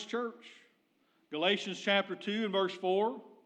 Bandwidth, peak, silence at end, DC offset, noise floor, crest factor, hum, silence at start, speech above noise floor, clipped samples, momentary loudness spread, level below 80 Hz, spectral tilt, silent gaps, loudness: 9.2 kHz; -16 dBFS; 0.2 s; under 0.1%; -73 dBFS; 18 dB; none; 0 s; 39 dB; under 0.1%; 10 LU; under -90 dBFS; -4.5 dB/octave; none; -33 LUFS